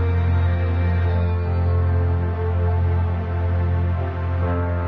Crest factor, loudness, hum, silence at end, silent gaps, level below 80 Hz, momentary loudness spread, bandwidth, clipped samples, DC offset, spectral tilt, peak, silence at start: 10 dB; -21 LUFS; none; 0 s; none; -28 dBFS; 3 LU; 4.2 kHz; under 0.1%; under 0.1%; -10.5 dB/octave; -10 dBFS; 0 s